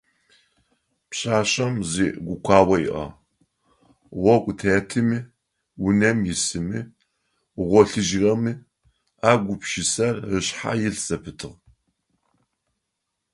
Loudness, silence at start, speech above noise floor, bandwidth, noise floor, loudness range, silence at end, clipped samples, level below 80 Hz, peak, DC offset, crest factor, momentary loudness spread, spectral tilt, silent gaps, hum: -22 LUFS; 1.1 s; 58 dB; 11.5 kHz; -79 dBFS; 3 LU; 1.8 s; under 0.1%; -48 dBFS; 0 dBFS; under 0.1%; 22 dB; 15 LU; -4.5 dB/octave; none; none